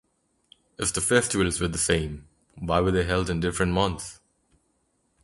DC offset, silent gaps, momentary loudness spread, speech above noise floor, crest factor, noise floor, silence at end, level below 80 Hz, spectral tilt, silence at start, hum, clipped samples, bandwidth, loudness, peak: under 0.1%; none; 14 LU; 46 dB; 22 dB; -71 dBFS; 1.1 s; -42 dBFS; -4 dB/octave; 0.8 s; none; under 0.1%; 11.5 kHz; -25 LUFS; -6 dBFS